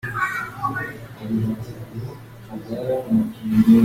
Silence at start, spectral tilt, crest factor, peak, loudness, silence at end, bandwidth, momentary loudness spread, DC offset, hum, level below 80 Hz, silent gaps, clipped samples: 0.05 s; -7.5 dB/octave; 18 dB; -4 dBFS; -24 LUFS; 0 s; 15.5 kHz; 15 LU; under 0.1%; none; -50 dBFS; none; under 0.1%